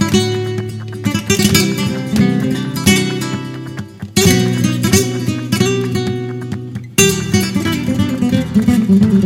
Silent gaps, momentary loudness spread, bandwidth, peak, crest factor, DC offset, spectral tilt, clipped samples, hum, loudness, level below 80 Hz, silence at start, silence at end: none; 11 LU; 16.5 kHz; 0 dBFS; 14 dB; under 0.1%; -4.5 dB/octave; under 0.1%; none; -15 LUFS; -40 dBFS; 0 s; 0 s